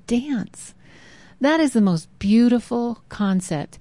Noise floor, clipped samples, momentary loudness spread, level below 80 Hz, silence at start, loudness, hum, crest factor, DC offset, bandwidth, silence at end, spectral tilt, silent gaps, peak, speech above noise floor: -48 dBFS; under 0.1%; 11 LU; -52 dBFS; 0.1 s; -21 LUFS; none; 14 dB; 0.2%; 11.5 kHz; 0.15 s; -6 dB/octave; none; -8 dBFS; 28 dB